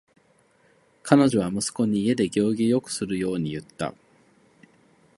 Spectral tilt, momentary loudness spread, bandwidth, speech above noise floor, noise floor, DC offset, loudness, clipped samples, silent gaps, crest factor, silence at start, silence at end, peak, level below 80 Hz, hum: -5.5 dB/octave; 14 LU; 11.5 kHz; 39 dB; -62 dBFS; under 0.1%; -24 LUFS; under 0.1%; none; 24 dB; 1.05 s; 1.25 s; 0 dBFS; -60 dBFS; none